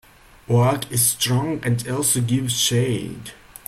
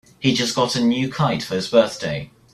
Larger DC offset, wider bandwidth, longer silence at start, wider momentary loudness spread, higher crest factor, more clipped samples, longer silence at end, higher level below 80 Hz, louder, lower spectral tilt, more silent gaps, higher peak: neither; first, 16 kHz vs 13.5 kHz; first, 0.5 s vs 0.2 s; about the same, 9 LU vs 9 LU; about the same, 16 dB vs 18 dB; neither; about the same, 0.35 s vs 0.25 s; about the same, -52 dBFS vs -54 dBFS; about the same, -20 LUFS vs -20 LUFS; about the same, -4 dB/octave vs -5 dB/octave; neither; about the same, -4 dBFS vs -2 dBFS